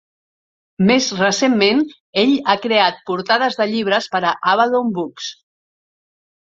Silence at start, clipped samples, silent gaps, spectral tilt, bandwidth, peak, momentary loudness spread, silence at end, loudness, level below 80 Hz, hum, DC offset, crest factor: 0.8 s; under 0.1%; 2.00-2.13 s; -4 dB/octave; 7.8 kHz; -2 dBFS; 9 LU; 1.15 s; -17 LUFS; -62 dBFS; none; under 0.1%; 18 dB